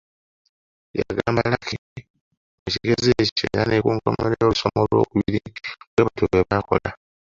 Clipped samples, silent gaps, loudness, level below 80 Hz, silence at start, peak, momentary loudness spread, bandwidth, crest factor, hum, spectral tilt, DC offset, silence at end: under 0.1%; 1.78-1.96 s, 2.10-2.14 s, 2.21-2.31 s, 2.37-2.66 s, 3.32-3.36 s, 5.87-5.97 s; -21 LUFS; -44 dBFS; 0.95 s; -2 dBFS; 11 LU; 7.6 kHz; 20 dB; none; -6 dB/octave; under 0.1%; 0.45 s